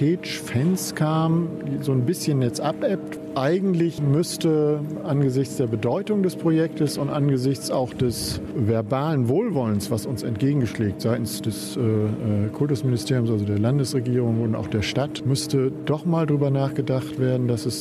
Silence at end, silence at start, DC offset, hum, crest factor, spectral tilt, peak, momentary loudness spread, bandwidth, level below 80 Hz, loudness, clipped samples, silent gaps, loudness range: 0 s; 0 s; under 0.1%; none; 14 dB; -6.5 dB/octave; -8 dBFS; 4 LU; 14.5 kHz; -52 dBFS; -23 LUFS; under 0.1%; none; 1 LU